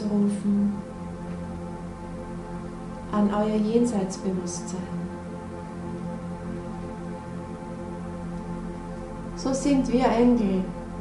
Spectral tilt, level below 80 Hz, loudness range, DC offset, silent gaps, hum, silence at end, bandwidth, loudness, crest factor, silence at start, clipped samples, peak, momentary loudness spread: -6.5 dB/octave; -44 dBFS; 9 LU; under 0.1%; none; none; 0 s; 11.5 kHz; -28 LUFS; 18 dB; 0 s; under 0.1%; -8 dBFS; 14 LU